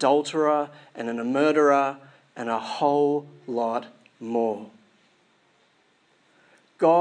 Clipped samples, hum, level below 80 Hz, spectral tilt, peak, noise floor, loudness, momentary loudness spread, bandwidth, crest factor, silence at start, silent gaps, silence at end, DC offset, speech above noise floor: under 0.1%; none; -88 dBFS; -5.5 dB/octave; -6 dBFS; -64 dBFS; -24 LUFS; 15 LU; 9.8 kHz; 18 dB; 0 s; none; 0 s; under 0.1%; 40 dB